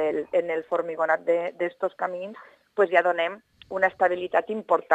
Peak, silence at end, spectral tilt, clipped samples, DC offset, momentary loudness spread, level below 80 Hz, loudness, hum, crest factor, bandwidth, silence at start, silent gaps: -4 dBFS; 0 s; -5.5 dB/octave; under 0.1%; under 0.1%; 12 LU; -72 dBFS; -25 LUFS; none; 22 dB; 8.8 kHz; 0 s; none